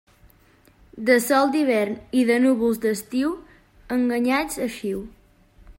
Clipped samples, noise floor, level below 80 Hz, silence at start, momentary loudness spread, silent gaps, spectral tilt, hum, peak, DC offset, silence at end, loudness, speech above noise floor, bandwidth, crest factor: under 0.1%; -56 dBFS; -54 dBFS; 0.95 s; 11 LU; none; -4.5 dB/octave; none; -6 dBFS; under 0.1%; 0.05 s; -22 LUFS; 35 dB; 16.5 kHz; 16 dB